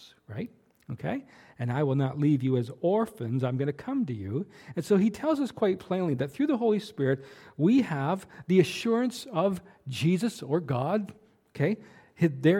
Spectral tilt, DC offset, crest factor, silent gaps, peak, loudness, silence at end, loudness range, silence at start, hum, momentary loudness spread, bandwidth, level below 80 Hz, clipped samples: -7.5 dB/octave; under 0.1%; 20 dB; none; -8 dBFS; -28 LUFS; 0 s; 2 LU; 0 s; none; 13 LU; 16 kHz; -68 dBFS; under 0.1%